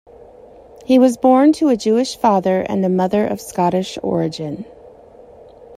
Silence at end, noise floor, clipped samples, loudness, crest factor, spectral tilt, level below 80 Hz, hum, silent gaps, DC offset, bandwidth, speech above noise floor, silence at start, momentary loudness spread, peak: 0 s; -42 dBFS; under 0.1%; -16 LUFS; 16 dB; -6.5 dB/octave; -54 dBFS; none; none; under 0.1%; 15 kHz; 27 dB; 0.9 s; 14 LU; -2 dBFS